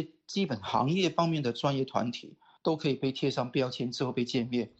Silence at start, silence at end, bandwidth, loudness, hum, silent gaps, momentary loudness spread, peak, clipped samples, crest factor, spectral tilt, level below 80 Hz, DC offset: 0 s; 0.1 s; 8.2 kHz; -31 LUFS; none; none; 6 LU; -12 dBFS; under 0.1%; 18 dB; -6 dB/octave; -68 dBFS; under 0.1%